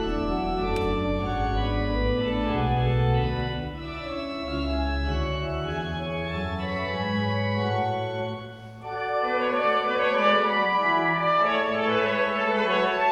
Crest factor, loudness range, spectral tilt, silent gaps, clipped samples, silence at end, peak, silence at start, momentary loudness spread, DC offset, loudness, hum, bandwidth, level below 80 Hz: 16 dB; 6 LU; -7 dB/octave; none; under 0.1%; 0 s; -8 dBFS; 0 s; 10 LU; under 0.1%; -25 LUFS; none; 10 kHz; -36 dBFS